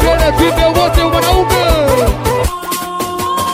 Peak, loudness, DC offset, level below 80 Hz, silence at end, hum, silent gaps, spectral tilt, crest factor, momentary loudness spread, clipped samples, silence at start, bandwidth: 0 dBFS; -12 LUFS; under 0.1%; -20 dBFS; 0 s; none; none; -4.5 dB/octave; 12 dB; 7 LU; under 0.1%; 0 s; 16.5 kHz